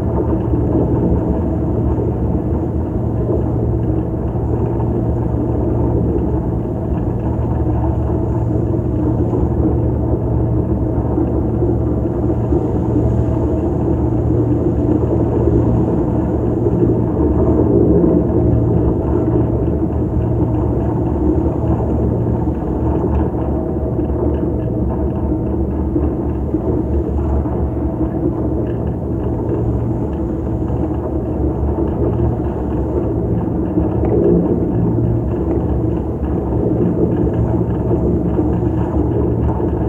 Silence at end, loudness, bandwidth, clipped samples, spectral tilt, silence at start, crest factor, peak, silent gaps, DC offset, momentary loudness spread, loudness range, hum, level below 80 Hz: 0 s; -17 LUFS; 3.1 kHz; under 0.1%; -12 dB/octave; 0 s; 16 dB; 0 dBFS; none; under 0.1%; 5 LU; 4 LU; none; -24 dBFS